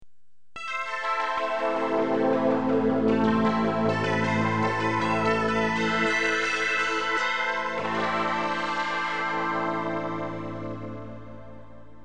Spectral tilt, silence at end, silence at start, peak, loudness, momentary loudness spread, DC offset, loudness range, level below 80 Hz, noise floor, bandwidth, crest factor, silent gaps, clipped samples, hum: -5.5 dB/octave; 0 s; 0 s; -12 dBFS; -25 LUFS; 11 LU; 0.7%; 4 LU; -56 dBFS; -68 dBFS; 9.8 kHz; 14 dB; none; under 0.1%; none